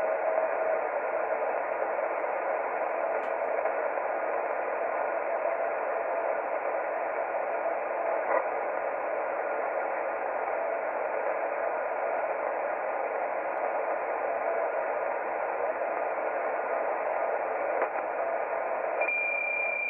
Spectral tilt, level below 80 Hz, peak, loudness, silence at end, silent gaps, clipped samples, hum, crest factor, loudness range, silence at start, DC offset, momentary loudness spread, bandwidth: -7 dB/octave; -76 dBFS; -12 dBFS; -30 LUFS; 0 s; none; under 0.1%; none; 18 dB; 1 LU; 0 s; under 0.1%; 3 LU; 3.3 kHz